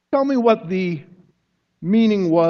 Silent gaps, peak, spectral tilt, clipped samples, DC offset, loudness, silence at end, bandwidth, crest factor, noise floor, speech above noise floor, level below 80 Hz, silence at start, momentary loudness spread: none; -2 dBFS; -8 dB/octave; under 0.1%; under 0.1%; -18 LUFS; 0 s; 6.6 kHz; 16 dB; -69 dBFS; 52 dB; -64 dBFS; 0.1 s; 12 LU